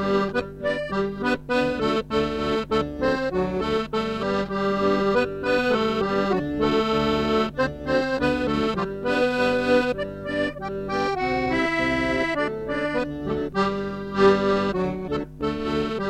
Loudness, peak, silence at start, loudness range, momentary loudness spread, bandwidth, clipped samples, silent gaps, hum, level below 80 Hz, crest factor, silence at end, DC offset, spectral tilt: -24 LUFS; -6 dBFS; 0 s; 2 LU; 6 LU; 12.5 kHz; under 0.1%; none; none; -44 dBFS; 18 dB; 0 s; under 0.1%; -6 dB/octave